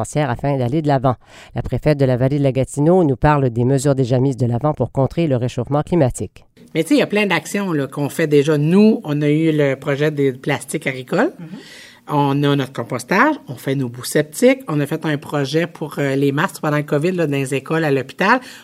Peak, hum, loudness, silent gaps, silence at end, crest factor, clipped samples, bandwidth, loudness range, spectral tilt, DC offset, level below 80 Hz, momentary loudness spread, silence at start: 0 dBFS; none; -18 LUFS; none; 0 s; 18 dB; under 0.1%; 15.5 kHz; 3 LU; -6.5 dB/octave; under 0.1%; -42 dBFS; 8 LU; 0 s